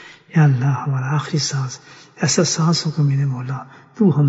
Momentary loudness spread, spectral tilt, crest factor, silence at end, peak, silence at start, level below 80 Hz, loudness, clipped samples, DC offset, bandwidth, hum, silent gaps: 12 LU; -5 dB/octave; 16 dB; 0 s; -2 dBFS; 0 s; -62 dBFS; -19 LUFS; under 0.1%; under 0.1%; 8 kHz; none; none